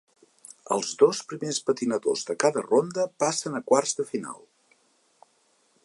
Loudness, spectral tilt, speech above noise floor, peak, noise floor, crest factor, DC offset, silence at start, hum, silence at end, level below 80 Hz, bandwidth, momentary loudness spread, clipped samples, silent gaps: -26 LUFS; -3.5 dB/octave; 41 dB; -6 dBFS; -66 dBFS; 20 dB; under 0.1%; 0.5 s; none; 1.5 s; -80 dBFS; 11.5 kHz; 10 LU; under 0.1%; none